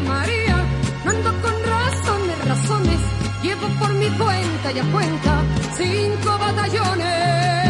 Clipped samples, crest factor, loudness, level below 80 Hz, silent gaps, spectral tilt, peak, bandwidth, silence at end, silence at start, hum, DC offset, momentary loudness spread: under 0.1%; 16 dB; -20 LUFS; -32 dBFS; none; -5.5 dB/octave; -2 dBFS; 11.5 kHz; 0 s; 0 s; none; under 0.1%; 3 LU